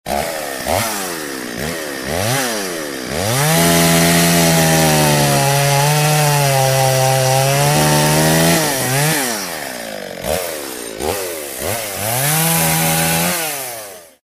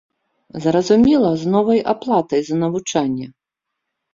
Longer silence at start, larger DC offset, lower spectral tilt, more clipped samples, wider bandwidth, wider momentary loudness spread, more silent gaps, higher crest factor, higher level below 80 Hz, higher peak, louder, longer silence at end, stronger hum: second, 0.05 s vs 0.55 s; neither; second, -3.5 dB/octave vs -6 dB/octave; neither; first, 16 kHz vs 7.6 kHz; about the same, 12 LU vs 10 LU; neither; about the same, 16 dB vs 14 dB; first, -42 dBFS vs -52 dBFS; first, 0 dBFS vs -4 dBFS; about the same, -15 LUFS vs -17 LUFS; second, 0.2 s vs 0.85 s; neither